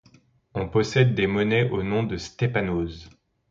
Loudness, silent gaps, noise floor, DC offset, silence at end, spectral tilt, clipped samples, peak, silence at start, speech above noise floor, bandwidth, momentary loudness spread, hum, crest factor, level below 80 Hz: -24 LUFS; none; -58 dBFS; under 0.1%; 0.4 s; -6.5 dB/octave; under 0.1%; -6 dBFS; 0.55 s; 35 dB; 7.6 kHz; 12 LU; none; 20 dB; -46 dBFS